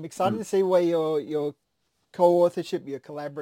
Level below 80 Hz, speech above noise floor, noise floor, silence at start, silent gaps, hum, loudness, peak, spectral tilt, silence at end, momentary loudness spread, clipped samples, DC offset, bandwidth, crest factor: -74 dBFS; 42 dB; -67 dBFS; 0 s; none; none; -24 LUFS; -8 dBFS; -6.5 dB/octave; 0 s; 15 LU; under 0.1%; under 0.1%; 16.5 kHz; 18 dB